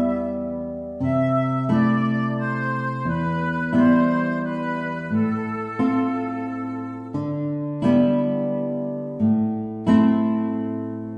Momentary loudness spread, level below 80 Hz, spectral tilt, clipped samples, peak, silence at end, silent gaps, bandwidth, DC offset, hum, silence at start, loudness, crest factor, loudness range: 10 LU; -54 dBFS; -9 dB/octave; under 0.1%; -4 dBFS; 0 s; none; 5.6 kHz; under 0.1%; none; 0 s; -23 LUFS; 18 dB; 4 LU